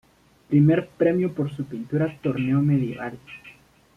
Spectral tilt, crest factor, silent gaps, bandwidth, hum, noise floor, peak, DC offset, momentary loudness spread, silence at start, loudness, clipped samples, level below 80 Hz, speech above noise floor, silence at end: -10 dB/octave; 16 dB; none; 4.9 kHz; none; -51 dBFS; -8 dBFS; under 0.1%; 16 LU; 0.5 s; -23 LUFS; under 0.1%; -58 dBFS; 29 dB; 0.45 s